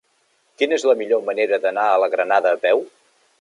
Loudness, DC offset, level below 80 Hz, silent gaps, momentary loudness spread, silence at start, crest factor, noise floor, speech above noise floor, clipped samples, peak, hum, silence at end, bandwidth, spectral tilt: -19 LUFS; under 0.1%; -82 dBFS; none; 4 LU; 0.6 s; 16 dB; -64 dBFS; 45 dB; under 0.1%; -4 dBFS; none; 0.55 s; 11 kHz; -2.5 dB/octave